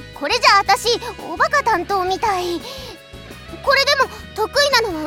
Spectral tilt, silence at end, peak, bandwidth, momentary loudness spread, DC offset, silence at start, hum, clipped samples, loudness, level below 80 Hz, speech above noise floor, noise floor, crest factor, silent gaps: -2 dB/octave; 0 s; -2 dBFS; 17.5 kHz; 20 LU; under 0.1%; 0 s; none; under 0.1%; -17 LUFS; -44 dBFS; 20 dB; -37 dBFS; 18 dB; none